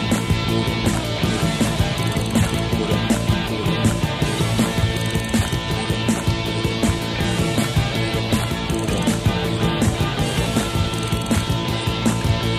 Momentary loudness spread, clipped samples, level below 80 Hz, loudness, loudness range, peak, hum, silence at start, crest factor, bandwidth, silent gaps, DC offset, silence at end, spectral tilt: 2 LU; under 0.1%; -32 dBFS; -20 LUFS; 1 LU; -4 dBFS; none; 0 s; 16 dB; 15.5 kHz; none; under 0.1%; 0 s; -5 dB/octave